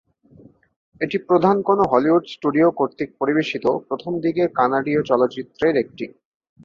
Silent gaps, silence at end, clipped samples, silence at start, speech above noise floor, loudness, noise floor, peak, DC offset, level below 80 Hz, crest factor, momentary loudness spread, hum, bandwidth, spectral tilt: none; 0.55 s; under 0.1%; 1 s; 30 dB; -20 LUFS; -50 dBFS; -2 dBFS; under 0.1%; -60 dBFS; 18 dB; 8 LU; none; 7 kHz; -7.5 dB/octave